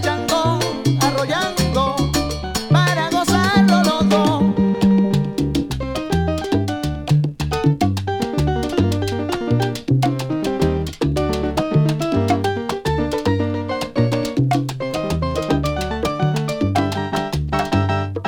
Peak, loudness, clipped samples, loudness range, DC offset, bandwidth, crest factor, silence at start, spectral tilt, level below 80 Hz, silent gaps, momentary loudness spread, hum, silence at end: -2 dBFS; -19 LUFS; under 0.1%; 4 LU; under 0.1%; 18.5 kHz; 16 dB; 0 s; -6 dB/octave; -34 dBFS; none; 7 LU; none; 0 s